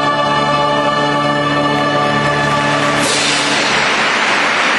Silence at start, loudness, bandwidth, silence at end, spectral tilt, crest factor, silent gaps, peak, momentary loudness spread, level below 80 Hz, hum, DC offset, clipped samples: 0 s; -13 LUFS; 12 kHz; 0 s; -3 dB/octave; 12 dB; none; -2 dBFS; 2 LU; -44 dBFS; none; under 0.1%; under 0.1%